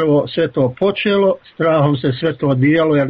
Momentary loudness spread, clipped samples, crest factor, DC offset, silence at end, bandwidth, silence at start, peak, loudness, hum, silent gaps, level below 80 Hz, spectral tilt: 5 LU; under 0.1%; 10 dB; under 0.1%; 0 s; 5.2 kHz; 0 s; -4 dBFS; -16 LUFS; none; none; -52 dBFS; -6 dB/octave